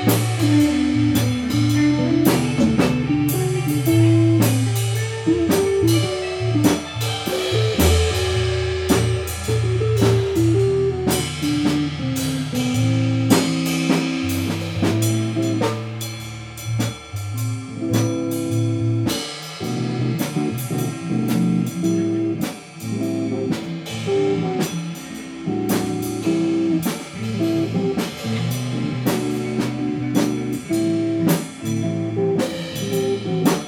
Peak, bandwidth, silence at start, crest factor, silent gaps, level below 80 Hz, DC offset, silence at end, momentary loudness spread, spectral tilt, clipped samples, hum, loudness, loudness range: -2 dBFS; 18.5 kHz; 0 s; 18 dB; none; -40 dBFS; under 0.1%; 0 s; 9 LU; -6 dB/octave; under 0.1%; none; -20 LUFS; 5 LU